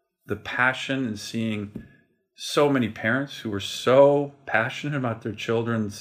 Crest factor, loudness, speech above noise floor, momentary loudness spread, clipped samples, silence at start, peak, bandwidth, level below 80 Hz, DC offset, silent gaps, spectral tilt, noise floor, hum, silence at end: 20 dB; -24 LUFS; 35 dB; 14 LU; under 0.1%; 0.3 s; -6 dBFS; 15.5 kHz; -66 dBFS; under 0.1%; none; -5.5 dB/octave; -59 dBFS; none; 0 s